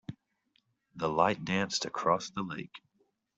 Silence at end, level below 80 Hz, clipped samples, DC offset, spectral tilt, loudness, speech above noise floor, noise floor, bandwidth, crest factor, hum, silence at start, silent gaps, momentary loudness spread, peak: 0.6 s; -68 dBFS; under 0.1%; under 0.1%; -4 dB/octave; -31 LUFS; 43 dB; -75 dBFS; 8.2 kHz; 24 dB; none; 0.1 s; none; 14 LU; -10 dBFS